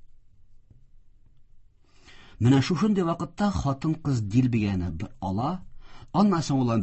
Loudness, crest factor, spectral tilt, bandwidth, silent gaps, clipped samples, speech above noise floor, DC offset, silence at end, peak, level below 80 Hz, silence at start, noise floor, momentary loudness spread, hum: -25 LUFS; 18 dB; -7 dB/octave; 8.4 kHz; none; under 0.1%; 30 dB; under 0.1%; 0 s; -10 dBFS; -46 dBFS; 0.05 s; -54 dBFS; 9 LU; none